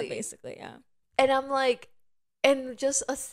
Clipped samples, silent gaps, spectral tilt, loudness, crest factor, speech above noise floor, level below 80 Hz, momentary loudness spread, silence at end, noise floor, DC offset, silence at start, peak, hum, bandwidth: under 0.1%; none; -2 dB/octave; -27 LUFS; 24 dB; 39 dB; -66 dBFS; 18 LU; 0 s; -67 dBFS; under 0.1%; 0 s; -6 dBFS; none; 16 kHz